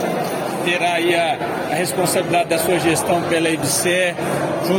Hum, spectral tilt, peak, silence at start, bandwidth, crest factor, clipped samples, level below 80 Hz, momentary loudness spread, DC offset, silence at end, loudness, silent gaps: none; -3.5 dB/octave; -4 dBFS; 0 s; 17 kHz; 14 dB; under 0.1%; -54 dBFS; 5 LU; under 0.1%; 0 s; -18 LUFS; none